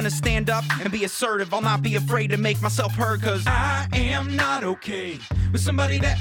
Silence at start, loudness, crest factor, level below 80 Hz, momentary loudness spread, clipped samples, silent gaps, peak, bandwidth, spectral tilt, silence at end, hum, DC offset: 0 s; -23 LUFS; 14 dB; -34 dBFS; 4 LU; under 0.1%; none; -8 dBFS; 19 kHz; -5 dB/octave; 0 s; none; under 0.1%